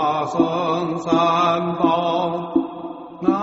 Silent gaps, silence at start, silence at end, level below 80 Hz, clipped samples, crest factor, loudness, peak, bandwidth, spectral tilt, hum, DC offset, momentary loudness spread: none; 0 s; 0 s; -58 dBFS; under 0.1%; 16 dB; -20 LUFS; -4 dBFS; 8 kHz; -5 dB/octave; none; under 0.1%; 6 LU